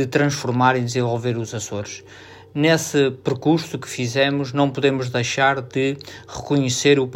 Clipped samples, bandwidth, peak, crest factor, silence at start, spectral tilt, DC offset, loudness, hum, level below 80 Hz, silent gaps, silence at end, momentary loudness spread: under 0.1%; 16 kHz; -4 dBFS; 18 dB; 0 s; -5 dB/octave; under 0.1%; -20 LUFS; none; -58 dBFS; none; 0 s; 12 LU